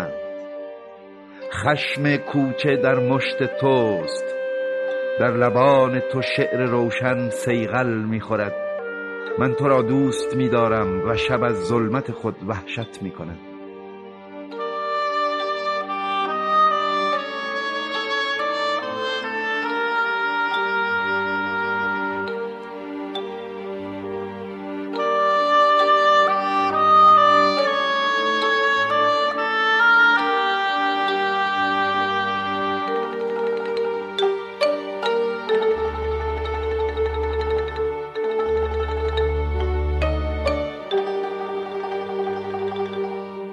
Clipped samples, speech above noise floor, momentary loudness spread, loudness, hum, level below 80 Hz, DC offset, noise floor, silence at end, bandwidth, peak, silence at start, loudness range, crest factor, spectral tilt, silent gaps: under 0.1%; 21 dB; 14 LU; -21 LUFS; none; -38 dBFS; under 0.1%; -42 dBFS; 0 s; 12 kHz; -4 dBFS; 0 s; 9 LU; 18 dB; -5.5 dB/octave; none